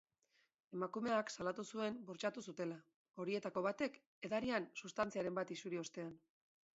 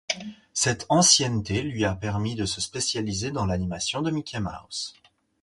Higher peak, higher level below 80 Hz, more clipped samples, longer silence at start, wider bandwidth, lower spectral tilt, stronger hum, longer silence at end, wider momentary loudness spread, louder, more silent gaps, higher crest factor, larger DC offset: second, -24 dBFS vs -4 dBFS; second, -80 dBFS vs -46 dBFS; neither; first, 0.7 s vs 0.1 s; second, 7.6 kHz vs 11.5 kHz; about the same, -4 dB/octave vs -3 dB/octave; neither; about the same, 0.55 s vs 0.5 s; second, 10 LU vs 14 LU; second, -44 LUFS vs -25 LUFS; first, 2.96-3.05 s, 4.06-4.22 s vs none; about the same, 20 dB vs 22 dB; neither